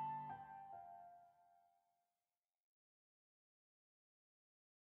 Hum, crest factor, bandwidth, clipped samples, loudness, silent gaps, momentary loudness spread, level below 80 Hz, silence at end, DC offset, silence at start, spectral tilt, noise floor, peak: none; 18 dB; 4 kHz; under 0.1%; -54 LUFS; none; 15 LU; under -90 dBFS; 3.2 s; under 0.1%; 0 s; -5.5 dB/octave; under -90 dBFS; -40 dBFS